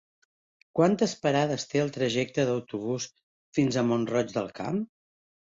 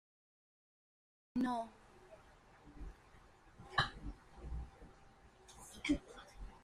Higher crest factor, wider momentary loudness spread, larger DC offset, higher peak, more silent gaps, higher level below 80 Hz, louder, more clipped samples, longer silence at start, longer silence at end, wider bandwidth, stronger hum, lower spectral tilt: second, 18 dB vs 26 dB; second, 8 LU vs 25 LU; neither; first, -10 dBFS vs -18 dBFS; first, 3.23-3.53 s vs none; second, -66 dBFS vs -56 dBFS; first, -28 LUFS vs -42 LUFS; neither; second, 0.75 s vs 1.35 s; first, 0.75 s vs 0 s; second, 7.8 kHz vs 14.5 kHz; neither; about the same, -5.5 dB/octave vs -4.5 dB/octave